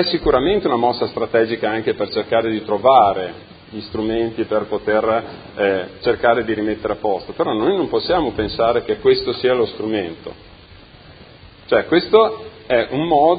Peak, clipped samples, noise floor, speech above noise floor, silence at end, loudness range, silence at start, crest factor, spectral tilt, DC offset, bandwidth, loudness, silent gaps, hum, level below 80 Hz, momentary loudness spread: 0 dBFS; under 0.1%; -43 dBFS; 25 dB; 0 s; 3 LU; 0 s; 18 dB; -9.5 dB/octave; under 0.1%; 5 kHz; -18 LUFS; none; none; -44 dBFS; 9 LU